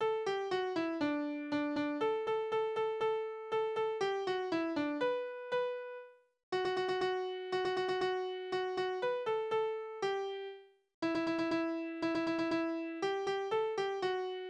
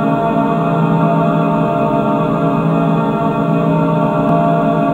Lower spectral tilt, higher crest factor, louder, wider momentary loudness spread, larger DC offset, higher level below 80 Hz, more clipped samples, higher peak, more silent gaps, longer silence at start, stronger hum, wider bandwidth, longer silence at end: second, -5 dB/octave vs -9.5 dB/octave; about the same, 12 dB vs 12 dB; second, -36 LUFS vs -14 LUFS; about the same, 4 LU vs 2 LU; neither; second, -76 dBFS vs -42 dBFS; neither; second, -22 dBFS vs 0 dBFS; first, 6.43-6.52 s, 10.94-11.02 s vs none; about the same, 0 s vs 0 s; neither; first, 9.8 kHz vs 7.2 kHz; about the same, 0 s vs 0 s